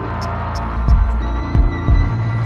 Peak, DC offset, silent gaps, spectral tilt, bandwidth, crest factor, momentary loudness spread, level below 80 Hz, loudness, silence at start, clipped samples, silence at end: -2 dBFS; under 0.1%; none; -8 dB/octave; 7 kHz; 12 dB; 6 LU; -18 dBFS; -19 LUFS; 0 s; under 0.1%; 0 s